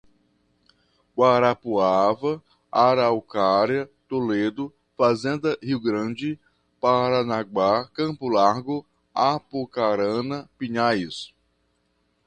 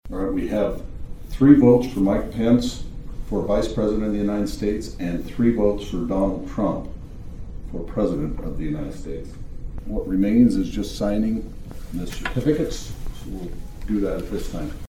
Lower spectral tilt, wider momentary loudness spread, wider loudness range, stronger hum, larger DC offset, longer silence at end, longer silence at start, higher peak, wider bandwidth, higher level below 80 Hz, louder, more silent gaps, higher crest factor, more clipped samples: about the same, -6.5 dB/octave vs -7.5 dB/octave; second, 12 LU vs 20 LU; second, 4 LU vs 8 LU; neither; neither; first, 1 s vs 0.05 s; first, 1.15 s vs 0.05 s; second, -4 dBFS vs 0 dBFS; second, 9.6 kHz vs 16 kHz; second, -62 dBFS vs -32 dBFS; about the same, -23 LUFS vs -22 LUFS; neither; about the same, 20 dB vs 22 dB; neither